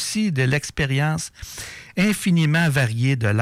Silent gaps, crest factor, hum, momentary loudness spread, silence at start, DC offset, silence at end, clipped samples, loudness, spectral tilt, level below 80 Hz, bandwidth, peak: none; 10 dB; none; 14 LU; 0 s; under 0.1%; 0 s; under 0.1%; -21 LUFS; -5.5 dB/octave; -46 dBFS; 16 kHz; -10 dBFS